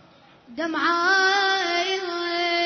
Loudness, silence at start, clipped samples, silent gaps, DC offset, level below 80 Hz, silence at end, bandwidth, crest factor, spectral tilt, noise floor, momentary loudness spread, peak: -21 LUFS; 0.5 s; under 0.1%; none; under 0.1%; -72 dBFS; 0 s; 6.6 kHz; 14 dB; -1 dB/octave; -52 dBFS; 10 LU; -8 dBFS